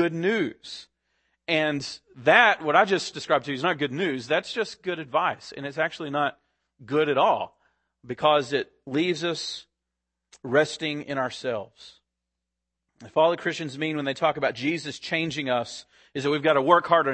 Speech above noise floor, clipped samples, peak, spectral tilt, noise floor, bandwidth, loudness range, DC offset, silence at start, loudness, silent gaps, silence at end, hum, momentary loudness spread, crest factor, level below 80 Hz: 59 dB; under 0.1%; -2 dBFS; -4.5 dB/octave; -84 dBFS; 8.8 kHz; 6 LU; under 0.1%; 0 s; -25 LUFS; none; 0 s; none; 15 LU; 24 dB; -70 dBFS